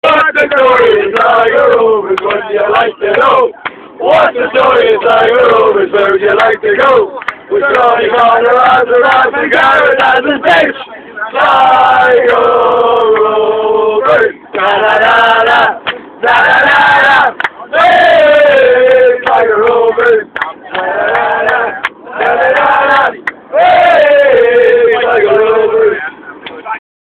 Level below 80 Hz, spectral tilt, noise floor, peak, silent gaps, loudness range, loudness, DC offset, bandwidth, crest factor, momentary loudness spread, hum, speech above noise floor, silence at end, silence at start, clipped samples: -48 dBFS; -4.5 dB/octave; -27 dBFS; 0 dBFS; none; 3 LU; -8 LUFS; under 0.1%; 8.8 kHz; 8 dB; 10 LU; none; 20 dB; 0.25 s; 0.05 s; 0.7%